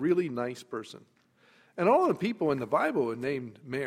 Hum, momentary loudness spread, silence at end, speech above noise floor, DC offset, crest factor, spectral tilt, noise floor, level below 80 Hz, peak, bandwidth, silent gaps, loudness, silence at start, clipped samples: none; 15 LU; 0 s; 34 dB; under 0.1%; 18 dB; -7 dB/octave; -63 dBFS; -72 dBFS; -12 dBFS; 13.5 kHz; none; -29 LUFS; 0 s; under 0.1%